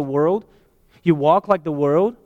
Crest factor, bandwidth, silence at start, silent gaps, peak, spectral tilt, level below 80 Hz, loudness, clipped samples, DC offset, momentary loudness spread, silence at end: 16 dB; 7.6 kHz; 0 s; none; -4 dBFS; -9 dB/octave; -58 dBFS; -19 LUFS; under 0.1%; under 0.1%; 6 LU; 0.1 s